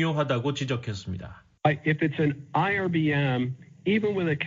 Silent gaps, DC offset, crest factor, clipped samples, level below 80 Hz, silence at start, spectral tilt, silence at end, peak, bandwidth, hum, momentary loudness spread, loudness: none; under 0.1%; 18 dB; under 0.1%; -60 dBFS; 0 s; -7 dB/octave; 0 s; -8 dBFS; 7.6 kHz; none; 10 LU; -26 LUFS